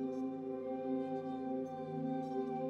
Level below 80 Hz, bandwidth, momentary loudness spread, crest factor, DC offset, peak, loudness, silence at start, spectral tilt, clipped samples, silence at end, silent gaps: -82 dBFS; 6.6 kHz; 2 LU; 12 dB; under 0.1%; -28 dBFS; -40 LUFS; 0 s; -9 dB/octave; under 0.1%; 0 s; none